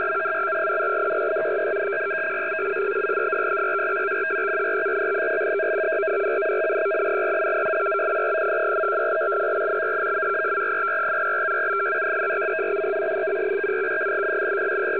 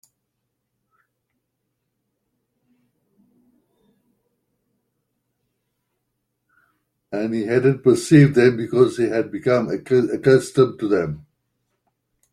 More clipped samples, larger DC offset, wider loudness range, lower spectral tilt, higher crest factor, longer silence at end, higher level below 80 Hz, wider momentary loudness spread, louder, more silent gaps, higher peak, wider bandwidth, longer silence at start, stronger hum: neither; first, 0.3% vs under 0.1%; second, 1 LU vs 10 LU; about the same, -7 dB/octave vs -7 dB/octave; second, 10 dB vs 20 dB; second, 0 s vs 1.15 s; second, -68 dBFS vs -60 dBFS; second, 2 LU vs 11 LU; second, -23 LUFS vs -18 LUFS; neither; second, -12 dBFS vs -2 dBFS; second, 4 kHz vs 12.5 kHz; second, 0 s vs 7.1 s; neither